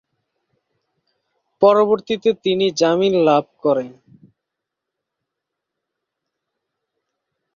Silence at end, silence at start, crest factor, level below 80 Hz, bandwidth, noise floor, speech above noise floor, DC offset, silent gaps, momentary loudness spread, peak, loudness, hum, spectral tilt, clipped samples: 3.65 s; 1.6 s; 20 dB; -66 dBFS; 7.4 kHz; -82 dBFS; 66 dB; under 0.1%; none; 6 LU; -2 dBFS; -17 LUFS; none; -5.5 dB/octave; under 0.1%